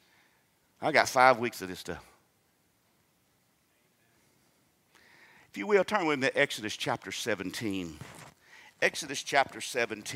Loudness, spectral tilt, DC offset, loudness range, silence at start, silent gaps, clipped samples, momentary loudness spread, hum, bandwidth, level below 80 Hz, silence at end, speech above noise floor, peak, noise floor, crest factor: -29 LUFS; -3 dB/octave; under 0.1%; 8 LU; 0.8 s; none; under 0.1%; 19 LU; none; 16 kHz; -70 dBFS; 0 s; 41 dB; -6 dBFS; -71 dBFS; 26 dB